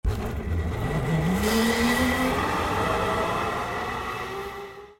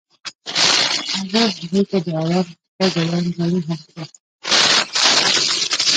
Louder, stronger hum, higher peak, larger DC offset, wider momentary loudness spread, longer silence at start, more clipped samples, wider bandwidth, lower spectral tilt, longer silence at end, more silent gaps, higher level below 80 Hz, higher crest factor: second, -25 LUFS vs -16 LUFS; neither; second, -10 dBFS vs 0 dBFS; neither; second, 9 LU vs 17 LU; second, 0.05 s vs 0.25 s; neither; first, 16.5 kHz vs 9.6 kHz; first, -5 dB/octave vs -2.5 dB/octave; about the same, 0.05 s vs 0 s; second, none vs 0.35-0.39 s, 2.68-2.79 s, 4.20-4.39 s; first, -36 dBFS vs -64 dBFS; about the same, 14 dB vs 18 dB